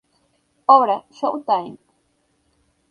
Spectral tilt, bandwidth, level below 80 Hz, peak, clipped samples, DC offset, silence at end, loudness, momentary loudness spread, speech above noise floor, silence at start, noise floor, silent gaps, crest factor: -6 dB/octave; 6.8 kHz; -72 dBFS; 0 dBFS; under 0.1%; under 0.1%; 1.15 s; -18 LUFS; 11 LU; 48 dB; 0.7 s; -66 dBFS; none; 22 dB